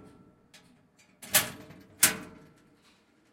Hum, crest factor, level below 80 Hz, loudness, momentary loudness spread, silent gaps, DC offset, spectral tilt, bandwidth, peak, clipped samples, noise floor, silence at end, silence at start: none; 30 dB; -68 dBFS; -26 LUFS; 25 LU; none; under 0.1%; -0.5 dB/octave; 16.5 kHz; -4 dBFS; under 0.1%; -64 dBFS; 1.05 s; 1.25 s